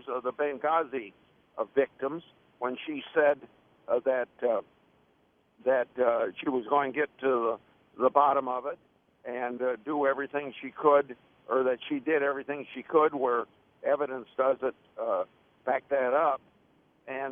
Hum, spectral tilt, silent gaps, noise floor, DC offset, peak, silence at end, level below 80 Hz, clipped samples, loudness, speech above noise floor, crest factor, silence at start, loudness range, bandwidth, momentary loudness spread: none; -8 dB/octave; none; -68 dBFS; under 0.1%; -8 dBFS; 0 s; -76 dBFS; under 0.1%; -29 LUFS; 39 dB; 22 dB; 0.05 s; 3 LU; 3.7 kHz; 13 LU